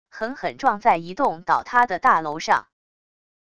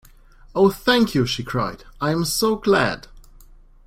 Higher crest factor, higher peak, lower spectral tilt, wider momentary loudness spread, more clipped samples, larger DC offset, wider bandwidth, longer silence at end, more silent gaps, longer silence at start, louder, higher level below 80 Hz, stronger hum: about the same, 18 dB vs 20 dB; about the same, -4 dBFS vs -2 dBFS; about the same, -4 dB/octave vs -4.5 dB/octave; about the same, 8 LU vs 10 LU; neither; first, 0.5% vs under 0.1%; second, 11 kHz vs 16.5 kHz; first, 0.8 s vs 0.65 s; neither; second, 0.15 s vs 0.55 s; about the same, -21 LUFS vs -20 LUFS; second, -60 dBFS vs -44 dBFS; neither